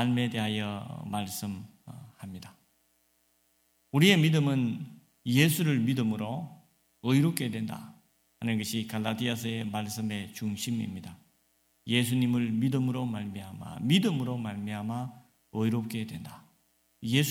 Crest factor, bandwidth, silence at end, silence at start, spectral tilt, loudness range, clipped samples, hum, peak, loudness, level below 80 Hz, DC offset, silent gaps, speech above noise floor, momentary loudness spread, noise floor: 24 dB; 17 kHz; 0 s; 0 s; -5.5 dB/octave; 7 LU; under 0.1%; none; -6 dBFS; -30 LUFS; -68 dBFS; under 0.1%; none; 42 dB; 19 LU; -71 dBFS